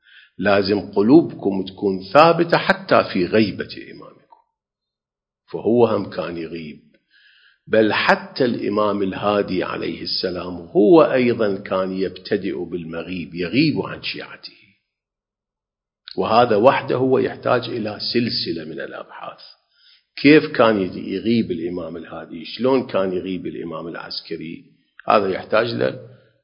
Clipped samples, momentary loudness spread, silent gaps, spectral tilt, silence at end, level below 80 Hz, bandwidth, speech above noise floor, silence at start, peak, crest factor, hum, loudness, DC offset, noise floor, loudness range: under 0.1%; 18 LU; none; -8 dB/octave; 0.3 s; -54 dBFS; 8 kHz; 69 dB; 0.4 s; 0 dBFS; 20 dB; none; -19 LUFS; under 0.1%; -88 dBFS; 7 LU